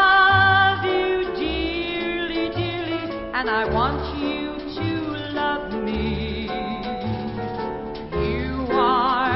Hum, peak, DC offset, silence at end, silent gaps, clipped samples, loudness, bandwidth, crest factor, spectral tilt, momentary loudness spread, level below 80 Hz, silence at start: none; -6 dBFS; under 0.1%; 0 s; none; under 0.1%; -22 LUFS; 5.8 kHz; 16 dB; -10 dB/octave; 11 LU; -38 dBFS; 0 s